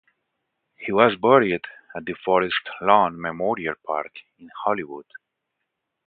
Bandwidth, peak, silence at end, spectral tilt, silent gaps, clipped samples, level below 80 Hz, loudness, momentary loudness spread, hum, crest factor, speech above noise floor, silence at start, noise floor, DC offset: 4.7 kHz; 0 dBFS; 0.9 s; -9.5 dB/octave; none; under 0.1%; -62 dBFS; -22 LUFS; 18 LU; none; 24 dB; 58 dB; 0.8 s; -80 dBFS; under 0.1%